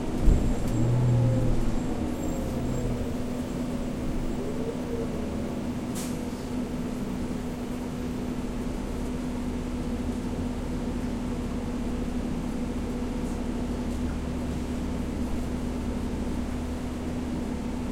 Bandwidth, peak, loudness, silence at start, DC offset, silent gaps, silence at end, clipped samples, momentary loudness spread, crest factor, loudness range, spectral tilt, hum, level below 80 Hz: 16.5 kHz; -8 dBFS; -31 LUFS; 0 s; under 0.1%; none; 0 s; under 0.1%; 7 LU; 22 dB; 4 LU; -7 dB/octave; none; -34 dBFS